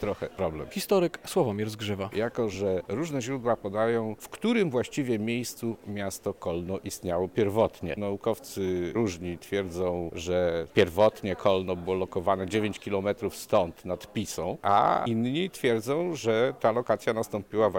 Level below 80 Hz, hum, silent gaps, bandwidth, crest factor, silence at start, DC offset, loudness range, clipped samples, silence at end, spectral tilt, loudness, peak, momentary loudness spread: -56 dBFS; none; none; 17.5 kHz; 18 dB; 0 s; 0.1%; 3 LU; under 0.1%; 0 s; -5.5 dB/octave; -29 LUFS; -10 dBFS; 8 LU